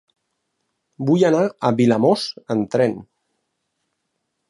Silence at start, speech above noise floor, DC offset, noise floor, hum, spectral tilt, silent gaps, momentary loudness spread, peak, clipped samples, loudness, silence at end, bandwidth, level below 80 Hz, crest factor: 1 s; 57 dB; under 0.1%; -75 dBFS; none; -6.5 dB/octave; none; 8 LU; -4 dBFS; under 0.1%; -19 LUFS; 1.5 s; 11.5 kHz; -64 dBFS; 18 dB